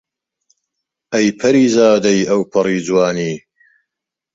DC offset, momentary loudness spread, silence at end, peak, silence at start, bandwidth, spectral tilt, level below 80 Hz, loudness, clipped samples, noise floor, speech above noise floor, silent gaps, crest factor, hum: under 0.1%; 10 LU; 0.95 s; 0 dBFS; 1.1 s; 7.8 kHz; -5 dB/octave; -56 dBFS; -14 LUFS; under 0.1%; -82 dBFS; 68 dB; none; 16 dB; none